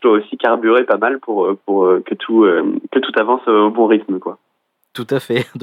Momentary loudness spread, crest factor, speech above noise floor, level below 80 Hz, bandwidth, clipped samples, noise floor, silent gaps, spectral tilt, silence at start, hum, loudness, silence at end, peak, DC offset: 9 LU; 14 dB; 52 dB; -76 dBFS; 12.5 kHz; under 0.1%; -67 dBFS; none; -7 dB/octave; 0 s; none; -15 LUFS; 0 s; -2 dBFS; under 0.1%